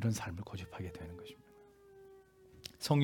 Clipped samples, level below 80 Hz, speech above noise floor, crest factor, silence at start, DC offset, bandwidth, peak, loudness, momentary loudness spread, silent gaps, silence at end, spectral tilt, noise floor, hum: under 0.1%; -66 dBFS; 20 dB; 24 dB; 0 s; under 0.1%; 18 kHz; -16 dBFS; -42 LUFS; 23 LU; none; 0 s; -6 dB/octave; -61 dBFS; none